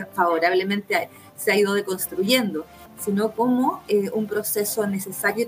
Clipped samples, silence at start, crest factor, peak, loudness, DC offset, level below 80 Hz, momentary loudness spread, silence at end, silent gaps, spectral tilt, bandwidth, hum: under 0.1%; 0 s; 18 dB; -6 dBFS; -23 LUFS; under 0.1%; -64 dBFS; 7 LU; 0 s; none; -4 dB/octave; 16 kHz; none